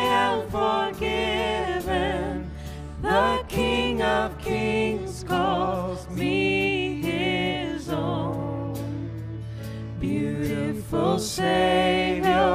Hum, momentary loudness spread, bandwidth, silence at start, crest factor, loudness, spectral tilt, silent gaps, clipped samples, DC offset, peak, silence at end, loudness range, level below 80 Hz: none; 11 LU; 15.5 kHz; 0 s; 16 dB; -25 LUFS; -5.5 dB/octave; none; under 0.1%; under 0.1%; -8 dBFS; 0 s; 4 LU; -40 dBFS